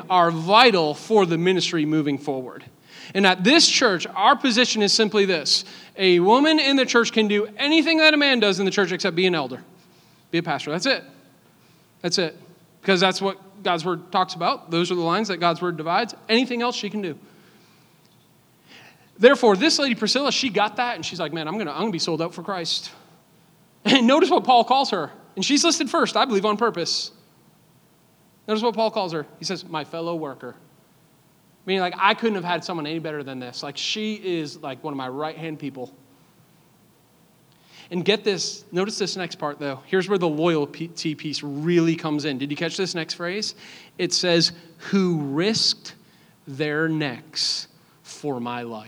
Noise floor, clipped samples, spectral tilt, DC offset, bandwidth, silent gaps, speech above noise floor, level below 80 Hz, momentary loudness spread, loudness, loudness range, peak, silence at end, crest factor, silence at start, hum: -57 dBFS; under 0.1%; -3.5 dB/octave; under 0.1%; over 20 kHz; none; 36 dB; -78 dBFS; 14 LU; -21 LUFS; 10 LU; 0 dBFS; 0 s; 22 dB; 0 s; none